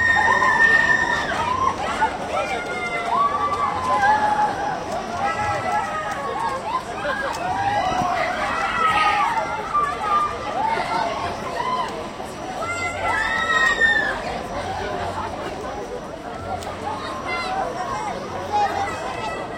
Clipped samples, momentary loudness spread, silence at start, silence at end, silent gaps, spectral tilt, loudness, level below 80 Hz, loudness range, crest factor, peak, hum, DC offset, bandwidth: under 0.1%; 12 LU; 0 s; 0 s; none; -3.5 dB/octave; -22 LUFS; -46 dBFS; 6 LU; 18 dB; -4 dBFS; none; under 0.1%; 16.5 kHz